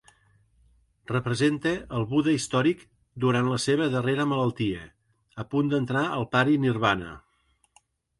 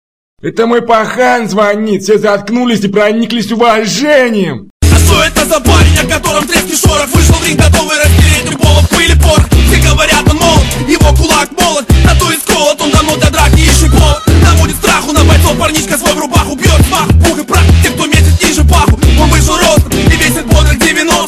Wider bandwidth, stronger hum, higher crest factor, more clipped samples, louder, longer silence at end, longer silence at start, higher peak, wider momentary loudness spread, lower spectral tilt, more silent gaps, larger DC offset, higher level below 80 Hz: second, 11.5 kHz vs 15.5 kHz; neither; first, 20 dB vs 8 dB; neither; second, -26 LUFS vs -8 LUFS; first, 1 s vs 0 s; first, 1.1 s vs 0.45 s; second, -6 dBFS vs 0 dBFS; first, 7 LU vs 4 LU; first, -6 dB/octave vs -4.5 dB/octave; second, none vs 4.70-4.80 s; second, under 0.1% vs 0.7%; second, -56 dBFS vs -14 dBFS